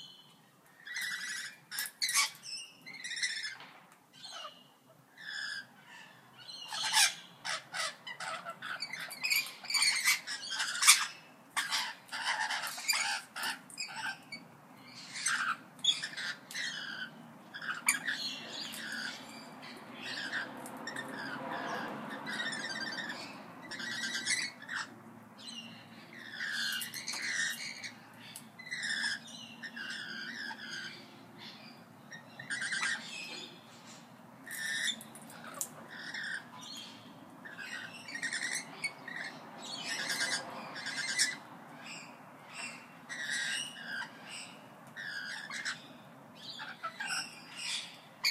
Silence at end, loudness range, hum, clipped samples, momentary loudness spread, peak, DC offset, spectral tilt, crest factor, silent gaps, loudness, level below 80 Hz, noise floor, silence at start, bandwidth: 0 s; 11 LU; none; under 0.1%; 19 LU; -6 dBFS; under 0.1%; 0.5 dB/octave; 34 dB; none; -35 LUFS; under -90 dBFS; -62 dBFS; 0 s; 15.5 kHz